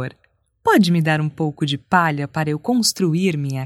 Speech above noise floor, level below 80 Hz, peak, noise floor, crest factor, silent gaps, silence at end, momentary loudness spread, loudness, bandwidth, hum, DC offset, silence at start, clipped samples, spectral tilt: 44 dB; -60 dBFS; 0 dBFS; -62 dBFS; 18 dB; none; 0 s; 8 LU; -19 LUFS; 16 kHz; none; under 0.1%; 0 s; under 0.1%; -5 dB/octave